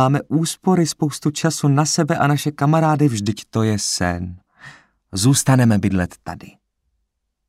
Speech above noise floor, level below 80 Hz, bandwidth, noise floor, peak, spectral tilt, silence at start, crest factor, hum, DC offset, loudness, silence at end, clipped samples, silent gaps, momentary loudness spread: 55 dB; -50 dBFS; 16 kHz; -73 dBFS; -4 dBFS; -5 dB/octave; 0 s; 16 dB; none; under 0.1%; -18 LUFS; 1 s; under 0.1%; none; 12 LU